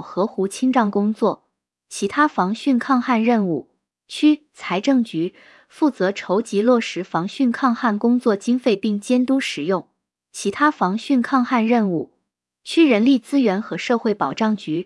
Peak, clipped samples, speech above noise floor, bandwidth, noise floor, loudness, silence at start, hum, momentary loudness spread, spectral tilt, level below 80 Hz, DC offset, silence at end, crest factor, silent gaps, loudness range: -4 dBFS; under 0.1%; 56 dB; 12 kHz; -75 dBFS; -20 LUFS; 0 s; none; 8 LU; -5.5 dB/octave; -70 dBFS; under 0.1%; 0 s; 16 dB; none; 2 LU